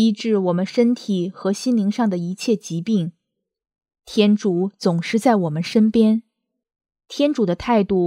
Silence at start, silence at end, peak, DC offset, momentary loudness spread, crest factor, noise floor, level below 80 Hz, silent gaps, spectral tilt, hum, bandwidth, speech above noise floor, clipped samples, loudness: 0 s; 0 s; -2 dBFS; under 0.1%; 6 LU; 18 dB; -79 dBFS; -54 dBFS; none; -6.5 dB/octave; none; 11.5 kHz; 61 dB; under 0.1%; -20 LUFS